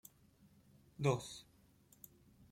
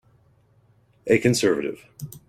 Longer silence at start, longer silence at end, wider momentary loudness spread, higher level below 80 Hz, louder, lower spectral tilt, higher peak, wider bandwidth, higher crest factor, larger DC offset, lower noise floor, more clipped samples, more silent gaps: about the same, 1 s vs 1.05 s; about the same, 0.1 s vs 0.1 s; first, 24 LU vs 19 LU; second, -72 dBFS vs -58 dBFS; second, -40 LUFS vs -22 LUFS; about the same, -6 dB/octave vs -5 dB/octave; second, -20 dBFS vs -6 dBFS; about the same, 16.5 kHz vs 16.5 kHz; first, 26 dB vs 20 dB; neither; first, -69 dBFS vs -60 dBFS; neither; neither